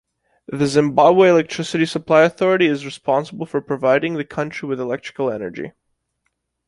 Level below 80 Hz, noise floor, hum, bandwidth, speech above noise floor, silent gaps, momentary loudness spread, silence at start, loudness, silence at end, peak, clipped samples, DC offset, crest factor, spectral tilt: -60 dBFS; -73 dBFS; none; 11.5 kHz; 55 dB; none; 12 LU; 0.5 s; -18 LUFS; 1 s; -2 dBFS; under 0.1%; under 0.1%; 18 dB; -6 dB/octave